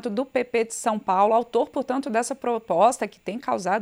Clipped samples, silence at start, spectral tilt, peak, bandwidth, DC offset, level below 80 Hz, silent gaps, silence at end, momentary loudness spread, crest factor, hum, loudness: under 0.1%; 0.05 s; -4 dB/octave; -6 dBFS; 15.5 kHz; under 0.1%; -68 dBFS; none; 0 s; 8 LU; 18 dB; none; -24 LUFS